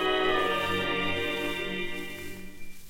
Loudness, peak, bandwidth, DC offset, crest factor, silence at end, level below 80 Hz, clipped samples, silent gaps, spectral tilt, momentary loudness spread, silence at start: -29 LUFS; -14 dBFS; 17 kHz; under 0.1%; 16 dB; 0 s; -48 dBFS; under 0.1%; none; -4 dB/octave; 16 LU; 0 s